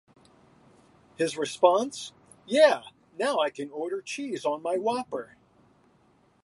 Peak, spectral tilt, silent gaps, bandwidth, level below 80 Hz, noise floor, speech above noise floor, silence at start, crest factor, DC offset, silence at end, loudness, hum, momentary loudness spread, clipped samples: -6 dBFS; -3.5 dB/octave; none; 11.5 kHz; -76 dBFS; -63 dBFS; 37 dB; 1.2 s; 22 dB; under 0.1%; 1.2 s; -27 LUFS; none; 16 LU; under 0.1%